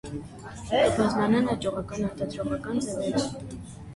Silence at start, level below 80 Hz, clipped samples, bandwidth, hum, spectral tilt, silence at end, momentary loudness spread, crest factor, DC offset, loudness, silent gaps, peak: 0.05 s; -50 dBFS; under 0.1%; 11.5 kHz; none; -5.5 dB/octave; 0 s; 17 LU; 16 dB; under 0.1%; -27 LUFS; none; -10 dBFS